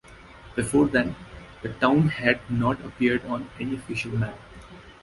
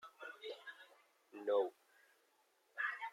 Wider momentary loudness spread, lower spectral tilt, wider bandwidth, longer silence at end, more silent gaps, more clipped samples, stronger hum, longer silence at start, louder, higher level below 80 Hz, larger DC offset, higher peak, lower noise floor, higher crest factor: second, 18 LU vs 22 LU; first, -6 dB/octave vs -3 dB/octave; second, 11.5 kHz vs 14.5 kHz; about the same, 0.1 s vs 0 s; neither; neither; neither; about the same, 0.1 s vs 0 s; first, -25 LUFS vs -43 LUFS; first, -48 dBFS vs under -90 dBFS; neither; first, -4 dBFS vs -24 dBFS; second, -47 dBFS vs -77 dBFS; about the same, 22 dB vs 20 dB